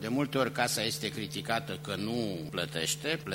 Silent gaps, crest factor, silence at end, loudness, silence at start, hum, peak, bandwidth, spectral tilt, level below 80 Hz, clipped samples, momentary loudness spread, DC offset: none; 22 dB; 0 s; -32 LUFS; 0 s; none; -10 dBFS; 16 kHz; -3.5 dB/octave; -64 dBFS; under 0.1%; 6 LU; under 0.1%